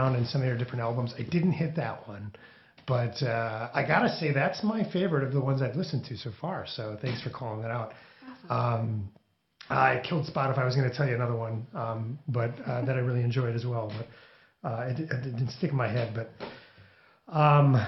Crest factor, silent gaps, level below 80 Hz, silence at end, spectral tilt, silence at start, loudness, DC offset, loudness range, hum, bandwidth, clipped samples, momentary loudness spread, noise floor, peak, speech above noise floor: 22 dB; none; -66 dBFS; 0 s; -8 dB/octave; 0 s; -29 LUFS; under 0.1%; 5 LU; none; 6 kHz; under 0.1%; 13 LU; -58 dBFS; -8 dBFS; 29 dB